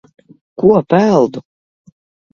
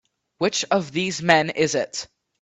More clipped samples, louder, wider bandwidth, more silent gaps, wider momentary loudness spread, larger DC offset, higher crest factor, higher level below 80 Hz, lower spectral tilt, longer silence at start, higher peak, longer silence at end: neither; first, -13 LUFS vs -22 LUFS; second, 7.2 kHz vs 8.4 kHz; neither; first, 20 LU vs 12 LU; neither; second, 16 dB vs 22 dB; first, -54 dBFS vs -62 dBFS; first, -8 dB/octave vs -3.5 dB/octave; first, 0.6 s vs 0.4 s; about the same, 0 dBFS vs 0 dBFS; first, 0.95 s vs 0.35 s